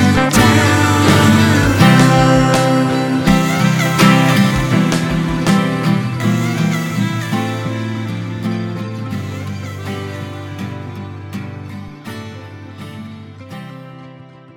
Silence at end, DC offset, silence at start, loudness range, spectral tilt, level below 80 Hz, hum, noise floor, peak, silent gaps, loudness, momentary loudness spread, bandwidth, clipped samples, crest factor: 0.3 s; under 0.1%; 0 s; 18 LU; -5.5 dB/octave; -36 dBFS; none; -38 dBFS; 0 dBFS; none; -14 LUFS; 21 LU; 18 kHz; under 0.1%; 14 dB